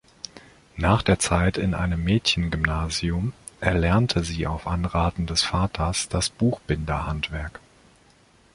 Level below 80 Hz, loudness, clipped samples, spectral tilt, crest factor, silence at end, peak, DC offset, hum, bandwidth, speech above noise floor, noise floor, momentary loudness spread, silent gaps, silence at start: -34 dBFS; -24 LUFS; under 0.1%; -5 dB/octave; 22 dB; 0.95 s; -2 dBFS; under 0.1%; none; 11.5 kHz; 33 dB; -57 dBFS; 9 LU; none; 0.35 s